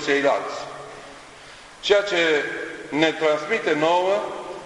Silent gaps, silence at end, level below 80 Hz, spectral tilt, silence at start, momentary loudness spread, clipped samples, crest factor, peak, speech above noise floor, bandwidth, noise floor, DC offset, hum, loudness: none; 0 s; -62 dBFS; -3.5 dB/octave; 0 s; 21 LU; under 0.1%; 20 dB; -2 dBFS; 23 dB; 11 kHz; -44 dBFS; under 0.1%; none; -22 LUFS